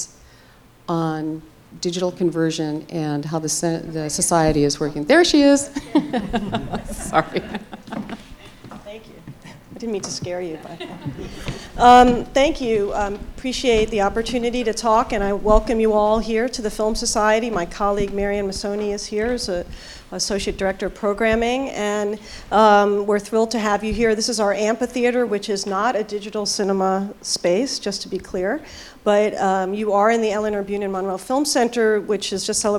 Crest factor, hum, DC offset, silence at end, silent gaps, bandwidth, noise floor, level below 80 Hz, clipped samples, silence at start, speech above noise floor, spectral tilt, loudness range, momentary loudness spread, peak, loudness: 20 dB; none; under 0.1%; 0 s; none; 17 kHz; -49 dBFS; -38 dBFS; under 0.1%; 0 s; 29 dB; -4 dB/octave; 7 LU; 15 LU; 0 dBFS; -20 LUFS